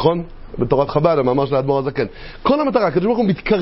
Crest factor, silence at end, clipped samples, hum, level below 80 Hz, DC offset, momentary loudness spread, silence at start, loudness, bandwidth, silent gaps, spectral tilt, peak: 18 dB; 0 s; under 0.1%; none; -38 dBFS; under 0.1%; 9 LU; 0 s; -18 LUFS; 5.8 kHz; none; -11.5 dB/octave; 0 dBFS